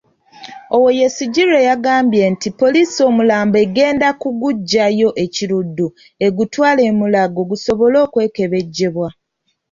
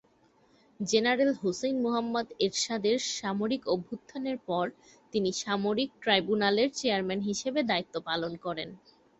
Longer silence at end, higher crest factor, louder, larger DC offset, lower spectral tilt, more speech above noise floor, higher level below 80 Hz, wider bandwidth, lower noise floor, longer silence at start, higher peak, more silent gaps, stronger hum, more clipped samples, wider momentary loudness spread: first, 0.6 s vs 0.45 s; second, 12 dB vs 20 dB; first, -14 LUFS vs -30 LUFS; neither; first, -5 dB/octave vs -3.5 dB/octave; first, 55 dB vs 35 dB; first, -54 dBFS vs -68 dBFS; about the same, 7.6 kHz vs 8.2 kHz; about the same, -68 dBFS vs -65 dBFS; second, 0.4 s vs 0.8 s; first, -2 dBFS vs -10 dBFS; neither; neither; neither; second, 7 LU vs 10 LU